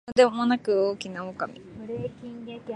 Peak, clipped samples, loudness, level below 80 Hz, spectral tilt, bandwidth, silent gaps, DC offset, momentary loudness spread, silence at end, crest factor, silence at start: -6 dBFS; under 0.1%; -26 LUFS; -62 dBFS; -5.5 dB/octave; 10 kHz; none; under 0.1%; 18 LU; 0 s; 20 dB; 0.05 s